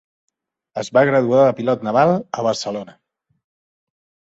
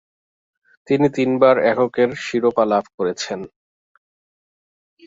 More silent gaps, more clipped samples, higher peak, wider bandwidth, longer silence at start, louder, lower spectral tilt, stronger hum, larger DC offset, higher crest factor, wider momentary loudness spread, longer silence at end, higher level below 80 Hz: second, none vs 2.94-2.98 s; neither; about the same, -2 dBFS vs -2 dBFS; about the same, 8 kHz vs 7.8 kHz; second, 0.75 s vs 0.9 s; about the same, -17 LUFS vs -18 LUFS; about the same, -6 dB/octave vs -5.5 dB/octave; neither; neither; about the same, 18 dB vs 18 dB; about the same, 14 LU vs 12 LU; second, 1.4 s vs 1.6 s; about the same, -64 dBFS vs -62 dBFS